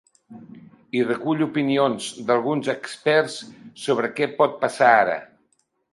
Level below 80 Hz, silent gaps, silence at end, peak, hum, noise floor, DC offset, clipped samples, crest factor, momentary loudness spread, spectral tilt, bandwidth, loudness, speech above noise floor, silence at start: -72 dBFS; none; 0.7 s; -2 dBFS; none; -68 dBFS; under 0.1%; under 0.1%; 22 dB; 12 LU; -5 dB/octave; 11.5 kHz; -22 LUFS; 47 dB; 0.3 s